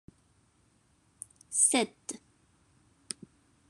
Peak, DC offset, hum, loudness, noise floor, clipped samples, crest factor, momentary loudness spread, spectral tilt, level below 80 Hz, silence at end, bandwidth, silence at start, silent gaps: -12 dBFS; under 0.1%; none; -28 LUFS; -68 dBFS; under 0.1%; 24 dB; 24 LU; -1 dB/octave; -74 dBFS; 1.55 s; 13 kHz; 1.5 s; none